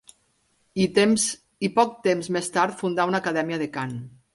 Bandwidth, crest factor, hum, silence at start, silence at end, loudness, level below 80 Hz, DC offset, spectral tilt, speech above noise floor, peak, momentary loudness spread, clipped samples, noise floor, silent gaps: 11.5 kHz; 18 dB; none; 0.75 s; 0.25 s; -24 LUFS; -64 dBFS; under 0.1%; -4 dB/octave; 44 dB; -6 dBFS; 10 LU; under 0.1%; -67 dBFS; none